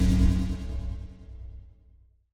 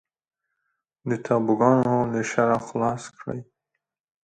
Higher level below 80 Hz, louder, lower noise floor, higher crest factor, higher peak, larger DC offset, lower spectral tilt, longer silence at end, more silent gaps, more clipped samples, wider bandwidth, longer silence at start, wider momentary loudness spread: first, -30 dBFS vs -62 dBFS; second, -29 LUFS vs -23 LUFS; second, -58 dBFS vs -78 dBFS; second, 16 dB vs 22 dB; second, -10 dBFS vs -4 dBFS; neither; about the same, -7.5 dB/octave vs -7 dB/octave; second, 0.65 s vs 0.8 s; neither; neither; first, 11.5 kHz vs 9.2 kHz; second, 0 s vs 1.05 s; first, 22 LU vs 16 LU